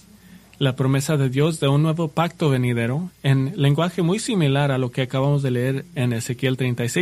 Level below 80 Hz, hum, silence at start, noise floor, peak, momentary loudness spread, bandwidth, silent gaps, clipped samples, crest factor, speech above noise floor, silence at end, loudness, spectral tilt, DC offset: -54 dBFS; none; 0.3 s; -47 dBFS; -4 dBFS; 5 LU; 13.5 kHz; none; under 0.1%; 16 dB; 27 dB; 0 s; -21 LUFS; -6.5 dB/octave; under 0.1%